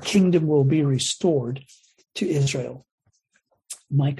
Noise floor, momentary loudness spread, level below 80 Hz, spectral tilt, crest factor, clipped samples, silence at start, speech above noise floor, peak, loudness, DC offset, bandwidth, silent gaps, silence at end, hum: -69 dBFS; 18 LU; -60 dBFS; -6 dB/octave; 16 dB; under 0.1%; 0 s; 48 dB; -8 dBFS; -22 LUFS; under 0.1%; 12.5 kHz; 2.91-2.98 s; 0 s; none